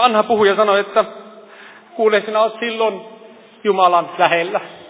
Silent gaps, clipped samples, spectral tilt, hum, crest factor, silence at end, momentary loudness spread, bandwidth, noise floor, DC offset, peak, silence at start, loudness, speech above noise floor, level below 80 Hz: none; under 0.1%; -8 dB/octave; none; 16 dB; 0 s; 9 LU; 4 kHz; -42 dBFS; under 0.1%; 0 dBFS; 0 s; -16 LUFS; 26 dB; -68 dBFS